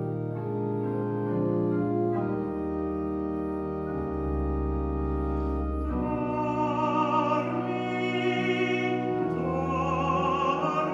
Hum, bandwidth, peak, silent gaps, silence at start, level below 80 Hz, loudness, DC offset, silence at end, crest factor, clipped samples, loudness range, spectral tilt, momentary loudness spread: none; 7.6 kHz; -14 dBFS; none; 0 s; -38 dBFS; -28 LUFS; under 0.1%; 0 s; 14 dB; under 0.1%; 3 LU; -8 dB/octave; 5 LU